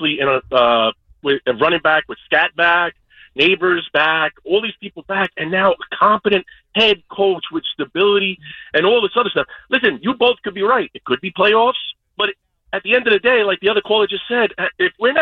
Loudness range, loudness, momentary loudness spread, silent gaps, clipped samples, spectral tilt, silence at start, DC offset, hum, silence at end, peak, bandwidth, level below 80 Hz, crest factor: 1 LU; -16 LUFS; 9 LU; none; under 0.1%; -6 dB/octave; 0 s; under 0.1%; none; 0 s; -2 dBFS; 6.4 kHz; -54 dBFS; 14 dB